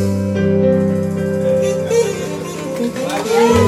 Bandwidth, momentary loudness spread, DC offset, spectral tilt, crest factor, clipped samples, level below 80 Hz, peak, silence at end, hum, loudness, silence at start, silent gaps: 15.5 kHz; 9 LU; under 0.1%; -6 dB/octave; 14 dB; under 0.1%; -44 dBFS; 0 dBFS; 0 s; none; -17 LUFS; 0 s; none